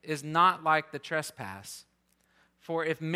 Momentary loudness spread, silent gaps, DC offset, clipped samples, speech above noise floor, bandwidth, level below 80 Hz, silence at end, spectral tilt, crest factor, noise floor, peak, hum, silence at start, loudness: 19 LU; none; under 0.1%; under 0.1%; 40 dB; 16 kHz; -78 dBFS; 0 s; -4.5 dB/octave; 20 dB; -70 dBFS; -10 dBFS; none; 0.05 s; -29 LUFS